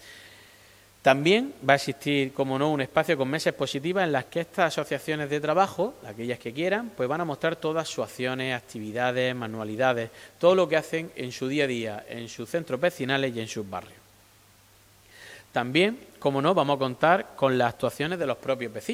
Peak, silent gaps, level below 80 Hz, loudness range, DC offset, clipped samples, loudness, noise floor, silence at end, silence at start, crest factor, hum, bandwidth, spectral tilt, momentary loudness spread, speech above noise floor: -4 dBFS; none; -66 dBFS; 5 LU; under 0.1%; under 0.1%; -26 LUFS; -57 dBFS; 0 s; 0 s; 24 dB; none; 16 kHz; -5 dB/octave; 11 LU; 31 dB